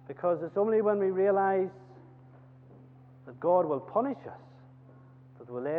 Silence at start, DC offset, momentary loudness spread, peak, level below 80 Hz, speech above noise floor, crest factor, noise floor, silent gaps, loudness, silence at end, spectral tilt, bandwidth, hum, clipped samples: 0.1 s; under 0.1%; 16 LU; -14 dBFS; -78 dBFS; 25 dB; 18 dB; -54 dBFS; none; -29 LUFS; 0 s; -10.5 dB/octave; 3.9 kHz; none; under 0.1%